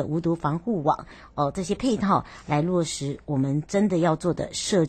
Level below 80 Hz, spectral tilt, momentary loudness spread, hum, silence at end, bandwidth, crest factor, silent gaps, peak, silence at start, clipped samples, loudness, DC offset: -50 dBFS; -6 dB/octave; 6 LU; none; 0 s; 12.5 kHz; 16 dB; none; -8 dBFS; 0 s; under 0.1%; -25 LUFS; under 0.1%